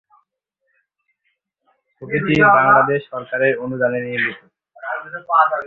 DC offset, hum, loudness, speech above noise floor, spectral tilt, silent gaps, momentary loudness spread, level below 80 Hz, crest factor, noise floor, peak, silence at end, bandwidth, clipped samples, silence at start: under 0.1%; none; -17 LUFS; 55 dB; -7.5 dB/octave; none; 16 LU; -56 dBFS; 18 dB; -73 dBFS; 0 dBFS; 0 s; 7.4 kHz; under 0.1%; 2 s